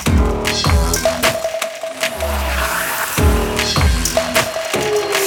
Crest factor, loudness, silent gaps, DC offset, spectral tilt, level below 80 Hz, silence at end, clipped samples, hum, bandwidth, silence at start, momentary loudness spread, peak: 16 dB; -17 LUFS; none; under 0.1%; -3.5 dB/octave; -22 dBFS; 0 s; under 0.1%; none; 19 kHz; 0 s; 6 LU; -2 dBFS